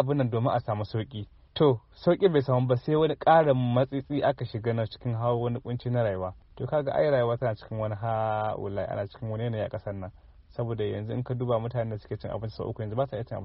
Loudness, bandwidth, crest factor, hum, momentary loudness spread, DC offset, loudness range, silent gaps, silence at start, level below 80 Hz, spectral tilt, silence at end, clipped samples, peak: -28 LUFS; 5.8 kHz; 18 dB; none; 12 LU; under 0.1%; 8 LU; none; 0 s; -54 dBFS; -6.5 dB/octave; 0 s; under 0.1%; -8 dBFS